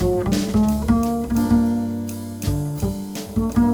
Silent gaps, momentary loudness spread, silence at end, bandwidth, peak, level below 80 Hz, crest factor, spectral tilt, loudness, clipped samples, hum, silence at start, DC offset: none; 9 LU; 0 s; over 20 kHz; -4 dBFS; -32 dBFS; 16 dB; -7 dB/octave; -21 LUFS; under 0.1%; none; 0 s; under 0.1%